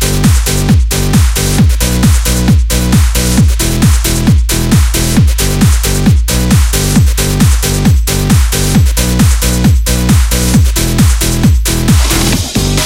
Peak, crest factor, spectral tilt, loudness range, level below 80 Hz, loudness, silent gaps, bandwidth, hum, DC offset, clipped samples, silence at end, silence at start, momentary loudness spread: 0 dBFS; 8 dB; -4.5 dB/octave; 0 LU; -12 dBFS; -10 LUFS; none; 17 kHz; none; under 0.1%; 0.2%; 0 s; 0 s; 1 LU